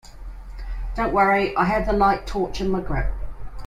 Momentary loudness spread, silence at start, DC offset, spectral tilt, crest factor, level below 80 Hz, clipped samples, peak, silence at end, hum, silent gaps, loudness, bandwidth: 21 LU; 0.05 s; under 0.1%; -6.5 dB/octave; 16 dB; -32 dBFS; under 0.1%; -6 dBFS; 0 s; none; none; -22 LUFS; 13.5 kHz